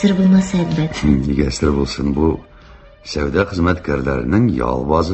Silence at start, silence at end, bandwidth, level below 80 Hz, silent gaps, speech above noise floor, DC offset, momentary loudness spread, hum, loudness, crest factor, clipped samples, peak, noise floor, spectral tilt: 0 s; 0 s; 8.4 kHz; -28 dBFS; none; 26 dB; under 0.1%; 6 LU; none; -17 LUFS; 14 dB; under 0.1%; -2 dBFS; -42 dBFS; -7 dB/octave